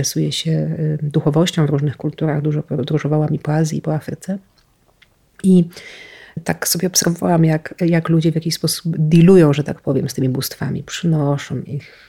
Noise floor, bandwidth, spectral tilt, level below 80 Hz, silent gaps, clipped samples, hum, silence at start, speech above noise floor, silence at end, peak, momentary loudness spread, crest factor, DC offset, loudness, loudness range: -56 dBFS; 16.5 kHz; -5.5 dB/octave; -52 dBFS; none; under 0.1%; none; 0 s; 40 dB; 0.25 s; -2 dBFS; 12 LU; 16 dB; under 0.1%; -17 LUFS; 6 LU